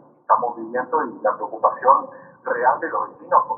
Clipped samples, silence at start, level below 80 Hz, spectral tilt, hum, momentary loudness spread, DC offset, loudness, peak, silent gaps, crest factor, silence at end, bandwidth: under 0.1%; 0.3 s; -80 dBFS; -8 dB/octave; none; 10 LU; under 0.1%; -21 LUFS; 0 dBFS; none; 20 dB; 0 s; 2.5 kHz